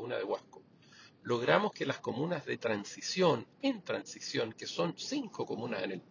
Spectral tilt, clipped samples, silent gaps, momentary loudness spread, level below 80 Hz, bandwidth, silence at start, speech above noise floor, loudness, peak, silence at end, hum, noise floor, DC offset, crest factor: -4.5 dB/octave; under 0.1%; none; 9 LU; -78 dBFS; 7.6 kHz; 0 s; 25 dB; -35 LUFS; -10 dBFS; 0.1 s; none; -59 dBFS; under 0.1%; 24 dB